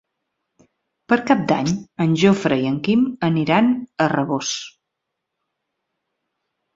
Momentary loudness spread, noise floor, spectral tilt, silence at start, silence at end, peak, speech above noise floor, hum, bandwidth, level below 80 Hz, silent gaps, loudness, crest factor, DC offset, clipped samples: 7 LU; -80 dBFS; -5.5 dB/octave; 1.1 s; 2.05 s; -2 dBFS; 61 dB; none; 7.8 kHz; -58 dBFS; none; -19 LUFS; 20 dB; under 0.1%; under 0.1%